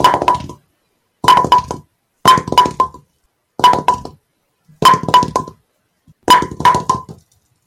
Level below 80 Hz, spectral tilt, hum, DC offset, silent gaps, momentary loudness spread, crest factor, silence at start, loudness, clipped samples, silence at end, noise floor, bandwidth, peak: -44 dBFS; -3.5 dB/octave; none; under 0.1%; none; 15 LU; 14 dB; 0 s; -13 LUFS; under 0.1%; 0.55 s; -64 dBFS; 16.5 kHz; 0 dBFS